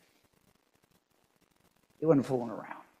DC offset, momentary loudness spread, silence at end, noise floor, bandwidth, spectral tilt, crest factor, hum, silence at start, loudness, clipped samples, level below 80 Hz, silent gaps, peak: under 0.1%; 16 LU; 0.2 s; -72 dBFS; 13 kHz; -8.5 dB/octave; 24 dB; none; 2 s; -31 LUFS; under 0.1%; -72 dBFS; none; -12 dBFS